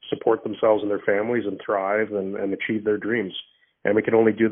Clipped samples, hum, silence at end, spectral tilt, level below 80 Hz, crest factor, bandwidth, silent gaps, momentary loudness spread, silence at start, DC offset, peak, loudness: under 0.1%; none; 0 s; -2 dB/octave; -66 dBFS; 18 dB; 3.8 kHz; none; 7 LU; 0.05 s; under 0.1%; -4 dBFS; -23 LUFS